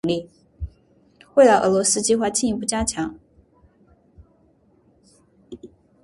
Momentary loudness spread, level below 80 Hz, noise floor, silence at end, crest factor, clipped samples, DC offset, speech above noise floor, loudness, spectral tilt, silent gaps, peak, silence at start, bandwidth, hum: 23 LU; -46 dBFS; -59 dBFS; 0.4 s; 20 dB; under 0.1%; under 0.1%; 40 dB; -19 LUFS; -3.5 dB/octave; none; -2 dBFS; 0.05 s; 11.5 kHz; none